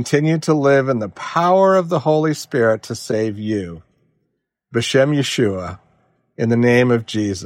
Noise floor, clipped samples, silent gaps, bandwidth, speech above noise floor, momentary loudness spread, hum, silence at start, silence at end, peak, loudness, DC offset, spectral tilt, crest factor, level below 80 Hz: -72 dBFS; under 0.1%; none; 16 kHz; 55 dB; 10 LU; none; 0 s; 0 s; -4 dBFS; -17 LUFS; under 0.1%; -6 dB/octave; 14 dB; -58 dBFS